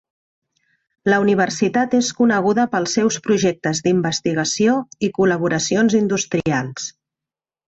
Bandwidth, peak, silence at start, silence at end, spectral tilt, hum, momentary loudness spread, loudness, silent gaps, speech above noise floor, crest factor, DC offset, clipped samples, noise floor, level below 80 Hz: 8.2 kHz; -4 dBFS; 1.05 s; 0.85 s; -4.5 dB/octave; none; 5 LU; -18 LUFS; none; 71 dB; 14 dB; under 0.1%; under 0.1%; -89 dBFS; -56 dBFS